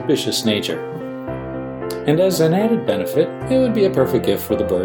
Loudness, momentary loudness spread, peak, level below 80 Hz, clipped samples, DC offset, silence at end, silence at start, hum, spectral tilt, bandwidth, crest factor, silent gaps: -19 LUFS; 12 LU; -2 dBFS; -46 dBFS; under 0.1%; under 0.1%; 0 s; 0 s; none; -5.5 dB/octave; 19 kHz; 16 dB; none